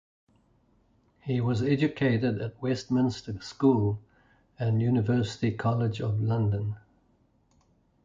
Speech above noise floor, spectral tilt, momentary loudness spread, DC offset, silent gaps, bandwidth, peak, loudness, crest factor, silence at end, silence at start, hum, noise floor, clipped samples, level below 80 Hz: 40 dB; -8 dB/octave; 10 LU; under 0.1%; none; 7.6 kHz; -10 dBFS; -28 LUFS; 18 dB; 1.25 s; 1.25 s; none; -66 dBFS; under 0.1%; -56 dBFS